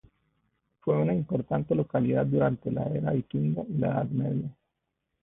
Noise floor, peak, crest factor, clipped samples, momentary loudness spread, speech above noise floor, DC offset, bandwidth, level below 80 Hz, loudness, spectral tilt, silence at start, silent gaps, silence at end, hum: -82 dBFS; -12 dBFS; 16 dB; under 0.1%; 5 LU; 55 dB; under 0.1%; 3.8 kHz; -58 dBFS; -28 LUFS; -13 dB/octave; 0.85 s; none; 0.7 s; none